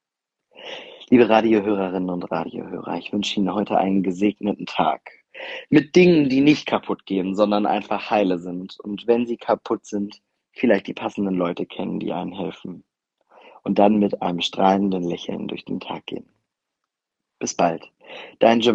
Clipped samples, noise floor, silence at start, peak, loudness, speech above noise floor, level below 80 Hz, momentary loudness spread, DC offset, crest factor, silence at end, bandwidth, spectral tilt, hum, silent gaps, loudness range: under 0.1%; -84 dBFS; 0.6 s; 0 dBFS; -21 LUFS; 63 dB; -62 dBFS; 16 LU; under 0.1%; 20 dB; 0 s; 8.2 kHz; -6 dB/octave; none; none; 7 LU